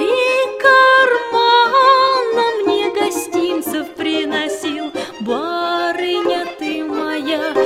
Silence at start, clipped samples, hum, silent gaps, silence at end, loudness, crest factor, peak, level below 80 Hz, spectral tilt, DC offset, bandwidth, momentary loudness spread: 0 s; under 0.1%; none; none; 0 s; -15 LUFS; 16 dB; 0 dBFS; -62 dBFS; -2.5 dB/octave; under 0.1%; 16 kHz; 12 LU